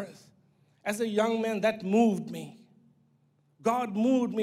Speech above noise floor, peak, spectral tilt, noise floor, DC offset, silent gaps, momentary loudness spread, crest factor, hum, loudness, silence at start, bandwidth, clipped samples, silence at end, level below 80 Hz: 40 dB; -14 dBFS; -6 dB/octave; -68 dBFS; under 0.1%; none; 15 LU; 16 dB; none; -28 LUFS; 0 s; 15 kHz; under 0.1%; 0 s; -82 dBFS